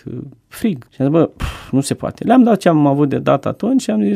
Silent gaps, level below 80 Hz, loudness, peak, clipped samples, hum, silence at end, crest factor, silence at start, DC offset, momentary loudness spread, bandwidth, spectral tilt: none; -38 dBFS; -16 LUFS; 0 dBFS; under 0.1%; none; 0 s; 16 dB; 0.05 s; under 0.1%; 11 LU; 15 kHz; -7 dB/octave